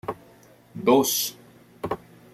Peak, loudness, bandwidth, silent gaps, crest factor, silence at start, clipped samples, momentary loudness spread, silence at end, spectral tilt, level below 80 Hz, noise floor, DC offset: -6 dBFS; -24 LUFS; 16 kHz; none; 22 dB; 0.05 s; under 0.1%; 20 LU; 0.4 s; -3.5 dB/octave; -62 dBFS; -53 dBFS; under 0.1%